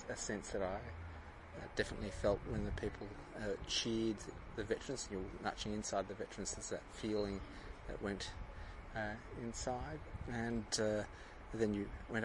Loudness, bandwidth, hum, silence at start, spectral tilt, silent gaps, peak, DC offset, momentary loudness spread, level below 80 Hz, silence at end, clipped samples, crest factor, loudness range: -43 LUFS; 11.5 kHz; none; 0 s; -4 dB/octave; none; -20 dBFS; under 0.1%; 12 LU; -54 dBFS; 0 s; under 0.1%; 22 dB; 4 LU